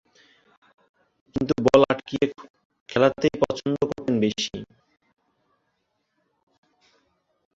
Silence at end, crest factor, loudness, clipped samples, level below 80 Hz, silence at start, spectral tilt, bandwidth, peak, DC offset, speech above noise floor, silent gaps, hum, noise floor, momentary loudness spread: 2.9 s; 26 dB; -23 LUFS; under 0.1%; -56 dBFS; 1.35 s; -5.5 dB/octave; 7.8 kHz; -2 dBFS; under 0.1%; 51 dB; 2.50-2.54 s, 2.65-2.70 s, 2.81-2.86 s; none; -75 dBFS; 11 LU